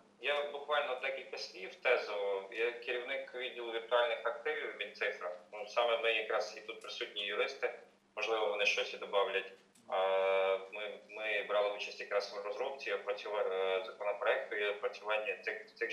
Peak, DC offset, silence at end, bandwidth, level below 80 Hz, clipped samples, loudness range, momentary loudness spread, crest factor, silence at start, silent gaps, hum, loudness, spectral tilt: -16 dBFS; under 0.1%; 0 s; 12 kHz; under -90 dBFS; under 0.1%; 2 LU; 10 LU; 20 dB; 0.2 s; none; none; -36 LUFS; -1.5 dB/octave